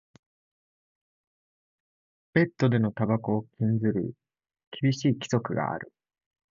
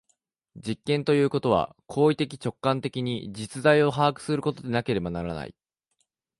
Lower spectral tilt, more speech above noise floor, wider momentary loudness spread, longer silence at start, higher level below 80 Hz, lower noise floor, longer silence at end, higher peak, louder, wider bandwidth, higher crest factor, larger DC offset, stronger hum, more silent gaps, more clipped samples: about the same, -7 dB/octave vs -6.5 dB/octave; first, over 64 dB vs 50 dB; second, 10 LU vs 13 LU; first, 2.35 s vs 0.55 s; second, -64 dBFS vs -56 dBFS; first, under -90 dBFS vs -76 dBFS; second, 0.7 s vs 0.9 s; about the same, -8 dBFS vs -6 dBFS; about the same, -27 LUFS vs -26 LUFS; second, 7.6 kHz vs 11.5 kHz; about the same, 20 dB vs 20 dB; neither; neither; first, 4.67-4.71 s vs none; neither